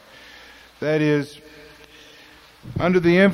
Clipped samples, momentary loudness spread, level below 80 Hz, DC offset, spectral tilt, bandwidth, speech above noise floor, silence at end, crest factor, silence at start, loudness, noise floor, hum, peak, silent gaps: under 0.1%; 26 LU; -52 dBFS; under 0.1%; -7.5 dB/octave; 13 kHz; 30 dB; 0 s; 18 dB; 0.8 s; -20 LUFS; -48 dBFS; none; -4 dBFS; none